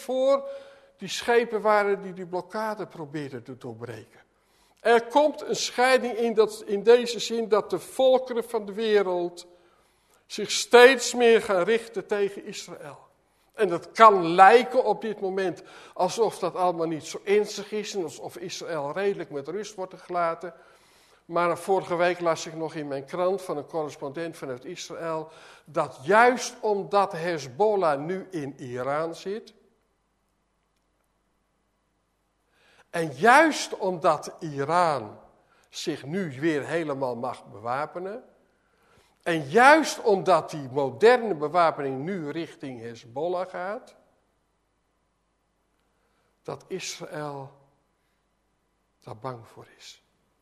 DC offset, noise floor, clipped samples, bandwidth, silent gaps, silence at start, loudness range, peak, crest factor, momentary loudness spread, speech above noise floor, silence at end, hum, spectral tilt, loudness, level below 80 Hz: under 0.1%; -72 dBFS; under 0.1%; 13.5 kHz; none; 0 s; 17 LU; 0 dBFS; 26 dB; 19 LU; 48 dB; 0.5 s; none; -4 dB/octave; -24 LUFS; -72 dBFS